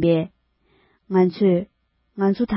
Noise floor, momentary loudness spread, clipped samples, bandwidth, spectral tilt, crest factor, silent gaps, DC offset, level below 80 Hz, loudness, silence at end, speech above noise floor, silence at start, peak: -62 dBFS; 19 LU; under 0.1%; 5.8 kHz; -12.5 dB/octave; 16 dB; none; under 0.1%; -52 dBFS; -21 LUFS; 0 s; 44 dB; 0 s; -6 dBFS